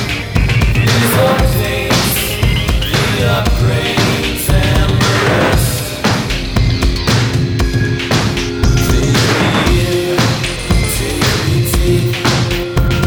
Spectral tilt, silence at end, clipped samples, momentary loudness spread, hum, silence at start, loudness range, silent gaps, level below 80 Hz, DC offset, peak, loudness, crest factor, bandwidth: -5 dB/octave; 0 s; under 0.1%; 4 LU; none; 0 s; 1 LU; none; -20 dBFS; under 0.1%; 0 dBFS; -13 LUFS; 12 dB; over 20 kHz